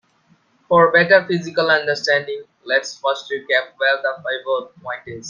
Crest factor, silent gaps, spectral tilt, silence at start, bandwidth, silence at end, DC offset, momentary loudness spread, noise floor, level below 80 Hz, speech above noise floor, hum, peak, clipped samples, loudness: 18 dB; none; -4 dB/octave; 0.7 s; 7.4 kHz; 0 s; under 0.1%; 15 LU; -58 dBFS; -64 dBFS; 40 dB; none; 0 dBFS; under 0.1%; -18 LUFS